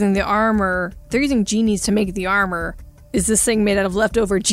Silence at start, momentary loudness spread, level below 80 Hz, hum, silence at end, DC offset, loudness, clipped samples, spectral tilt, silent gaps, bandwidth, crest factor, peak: 0 s; 7 LU; -36 dBFS; none; 0 s; under 0.1%; -18 LUFS; under 0.1%; -4 dB/octave; none; 16 kHz; 14 dB; -4 dBFS